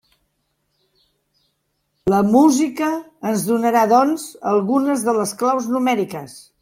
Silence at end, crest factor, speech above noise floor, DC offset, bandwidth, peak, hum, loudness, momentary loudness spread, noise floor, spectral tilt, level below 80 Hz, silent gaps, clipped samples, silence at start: 0.2 s; 16 dB; 53 dB; under 0.1%; 16.5 kHz; -2 dBFS; none; -18 LUFS; 11 LU; -70 dBFS; -5.5 dB/octave; -58 dBFS; none; under 0.1%; 2.05 s